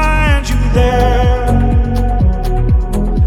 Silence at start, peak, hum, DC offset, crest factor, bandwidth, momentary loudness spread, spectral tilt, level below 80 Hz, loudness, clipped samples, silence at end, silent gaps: 0 s; 0 dBFS; none; under 0.1%; 10 dB; 12.5 kHz; 3 LU; -7 dB/octave; -14 dBFS; -14 LUFS; under 0.1%; 0 s; none